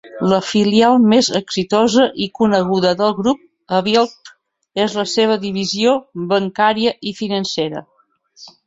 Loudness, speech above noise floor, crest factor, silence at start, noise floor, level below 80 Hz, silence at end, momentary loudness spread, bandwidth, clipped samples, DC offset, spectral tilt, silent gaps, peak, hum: -16 LUFS; 32 dB; 16 dB; 0.05 s; -47 dBFS; -56 dBFS; 0.15 s; 9 LU; 8 kHz; under 0.1%; under 0.1%; -5 dB/octave; none; 0 dBFS; none